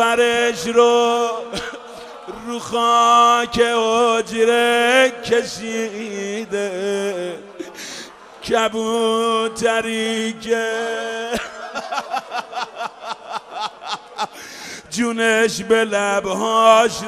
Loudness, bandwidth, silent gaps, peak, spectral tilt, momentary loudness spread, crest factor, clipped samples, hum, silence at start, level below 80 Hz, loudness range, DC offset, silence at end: -18 LUFS; 14 kHz; none; 0 dBFS; -2.5 dB/octave; 17 LU; 18 dB; under 0.1%; none; 0 s; -56 dBFS; 11 LU; under 0.1%; 0 s